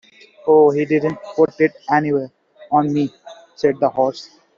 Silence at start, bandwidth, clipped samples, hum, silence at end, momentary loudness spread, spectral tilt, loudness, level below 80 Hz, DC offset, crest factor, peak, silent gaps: 0.45 s; 7.2 kHz; under 0.1%; none; 0.35 s; 11 LU; -6 dB/octave; -18 LUFS; -62 dBFS; under 0.1%; 16 dB; -2 dBFS; none